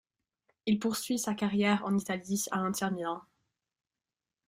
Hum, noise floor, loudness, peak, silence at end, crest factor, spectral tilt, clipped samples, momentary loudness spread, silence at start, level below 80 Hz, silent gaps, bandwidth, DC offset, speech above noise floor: none; under -90 dBFS; -32 LUFS; -12 dBFS; 1.25 s; 20 dB; -4.5 dB/octave; under 0.1%; 8 LU; 0.65 s; -72 dBFS; none; 16 kHz; under 0.1%; over 59 dB